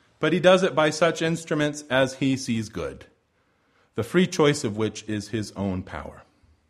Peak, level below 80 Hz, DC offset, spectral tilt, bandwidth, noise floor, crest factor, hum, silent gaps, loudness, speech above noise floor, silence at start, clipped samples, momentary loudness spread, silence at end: -4 dBFS; -54 dBFS; under 0.1%; -5 dB/octave; 13.5 kHz; -67 dBFS; 20 dB; none; none; -24 LUFS; 44 dB; 0.2 s; under 0.1%; 15 LU; 0.5 s